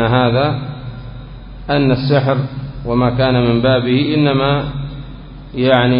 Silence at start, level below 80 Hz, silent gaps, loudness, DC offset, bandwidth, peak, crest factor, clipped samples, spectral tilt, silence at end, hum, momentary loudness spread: 0 s; -34 dBFS; none; -15 LUFS; under 0.1%; 5.4 kHz; 0 dBFS; 16 dB; under 0.1%; -11 dB/octave; 0 s; none; 19 LU